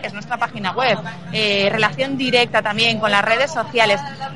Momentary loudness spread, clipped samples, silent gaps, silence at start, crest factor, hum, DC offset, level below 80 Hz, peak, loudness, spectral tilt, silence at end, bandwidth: 8 LU; under 0.1%; none; 0 s; 18 dB; none; 0.7%; -58 dBFS; -2 dBFS; -17 LUFS; -4 dB/octave; 0 s; 11.5 kHz